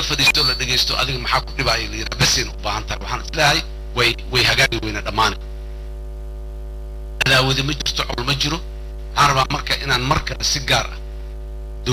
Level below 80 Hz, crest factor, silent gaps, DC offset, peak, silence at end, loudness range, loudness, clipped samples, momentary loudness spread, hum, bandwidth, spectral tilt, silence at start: -30 dBFS; 16 dB; none; under 0.1%; -4 dBFS; 0 s; 3 LU; -18 LUFS; under 0.1%; 19 LU; none; 16 kHz; -3 dB/octave; 0 s